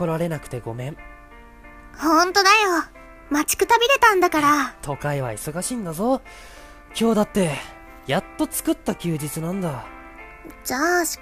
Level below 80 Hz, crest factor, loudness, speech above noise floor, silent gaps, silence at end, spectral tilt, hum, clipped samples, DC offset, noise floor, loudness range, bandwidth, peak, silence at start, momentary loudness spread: -48 dBFS; 20 dB; -21 LUFS; 23 dB; none; 0 s; -4 dB/octave; none; under 0.1%; under 0.1%; -44 dBFS; 7 LU; 15.5 kHz; -2 dBFS; 0 s; 21 LU